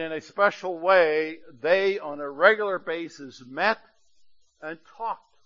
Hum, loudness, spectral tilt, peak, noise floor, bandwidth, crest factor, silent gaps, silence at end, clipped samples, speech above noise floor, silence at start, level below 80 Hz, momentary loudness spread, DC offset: none; -24 LUFS; -4.5 dB/octave; -4 dBFS; -61 dBFS; 7.6 kHz; 22 dB; none; 0.3 s; under 0.1%; 36 dB; 0 s; -76 dBFS; 19 LU; under 0.1%